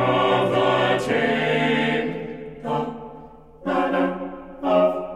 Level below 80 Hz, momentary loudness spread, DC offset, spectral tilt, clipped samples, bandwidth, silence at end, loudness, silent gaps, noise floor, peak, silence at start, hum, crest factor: -52 dBFS; 14 LU; under 0.1%; -6 dB/octave; under 0.1%; 13.5 kHz; 0 s; -22 LUFS; none; -43 dBFS; -6 dBFS; 0 s; none; 16 dB